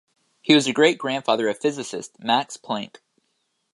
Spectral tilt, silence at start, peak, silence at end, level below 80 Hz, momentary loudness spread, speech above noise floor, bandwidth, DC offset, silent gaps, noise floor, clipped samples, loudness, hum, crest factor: -4 dB/octave; 0.45 s; -2 dBFS; 0.85 s; -74 dBFS; 14 LU; 51 dB; 11.5 kHz; under 0.1%; none; -72 dBFS; under 0.1%; -22 LUFS; none; 22 dB